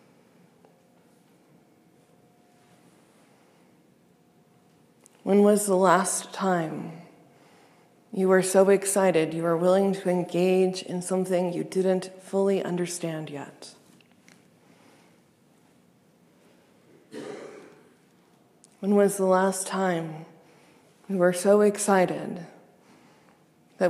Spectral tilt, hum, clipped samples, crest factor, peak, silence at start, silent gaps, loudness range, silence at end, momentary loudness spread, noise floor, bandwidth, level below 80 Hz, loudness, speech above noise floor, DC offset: -5 dB/octave; none; under 0.1%; 22 dB; -6 dBFS; 5.25 s; none; 9 LU; 0 s; 20 LU; -61 dBFS; 15 kHz; -82 dBFS; -24 LUFS; 37 dB; under 0.1%